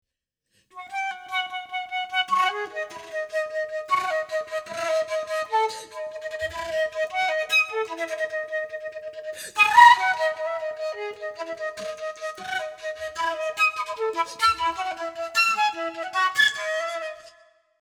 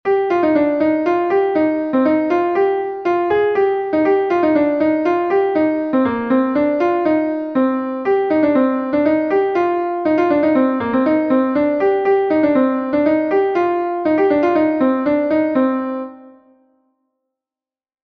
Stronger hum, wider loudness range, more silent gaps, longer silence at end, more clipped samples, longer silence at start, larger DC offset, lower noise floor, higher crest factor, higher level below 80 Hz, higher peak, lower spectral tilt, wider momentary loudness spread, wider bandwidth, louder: neither; first, 7 LU vs 1 LU; neither; second, 0.55 s vs 1.75 s; neither; first, 0.75 s vs 0.05 s; neither; second, -81 dBFS vs under -90 dBFS; first, 24 dB vs 12 dB; second, -64 dBFS vs -56 dBFS; first, 0 dBFS vs -4 dBFS; second, -0.5 dB/octave vs -8 dB/octave; first, 13 LU vs 4 LU; first, 19.5 kHz vs 6.2 kHz; second, -24 LUFS vs -16 LUFS